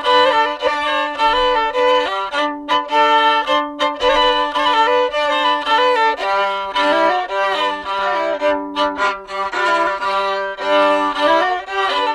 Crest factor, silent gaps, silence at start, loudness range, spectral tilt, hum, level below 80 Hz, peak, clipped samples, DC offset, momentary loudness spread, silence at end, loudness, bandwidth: 14 dB; none; 0 s; 3 LU; -2 dB/octave; none; -46 dBFS; -2 dBFS; under 0.1%; under 0.1%; 6 LU; 0 s; -16 LUFS; 12 kHz